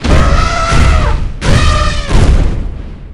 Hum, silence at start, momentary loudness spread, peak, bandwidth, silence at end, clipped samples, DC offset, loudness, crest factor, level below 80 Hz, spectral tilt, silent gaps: none; 0 s; 9 LU; 0 dBFS; 11 kHz; 0 s; 2%; under 0.1%; -12 LUFS; 8 dB; -12 dBFS; -5.5 dB/octave; none